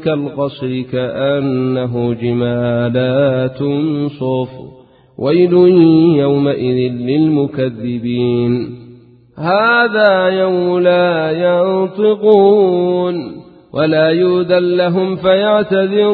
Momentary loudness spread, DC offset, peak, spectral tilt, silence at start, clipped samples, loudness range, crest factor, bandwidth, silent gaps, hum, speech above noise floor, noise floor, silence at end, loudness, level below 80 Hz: 10 LU; under 0.1%; 0 dBFS; -11 dB/octave; 0 s; under 0.1%; 4 LU; 14 dB; 4.8 kHz; none; none; 28 dB; -41 dBFS; 0 s; -13 LUFS; -52 dBFS